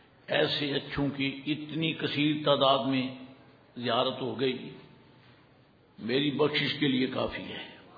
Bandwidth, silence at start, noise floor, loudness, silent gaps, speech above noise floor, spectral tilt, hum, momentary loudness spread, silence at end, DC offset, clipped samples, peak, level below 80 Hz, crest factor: 5 kHz; 0.3 s; -60 dBFS; -29 LUFS; none; 31 dB; -7.5 dB/octave; none; 14 LU; 0 s; under 0.1%; under 0.1%; -10 dBFS; -62 dBFS; 20 dB